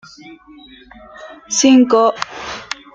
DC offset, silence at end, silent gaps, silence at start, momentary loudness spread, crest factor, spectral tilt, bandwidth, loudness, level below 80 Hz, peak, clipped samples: under 0.1%; 0.3 s; none; 0.25 s; 26 LU; 16 dB; -2.5 dB/octave; 8.8 kHz; -14 LUFS; -56 dBFS; -2 dBFS; under 0.1%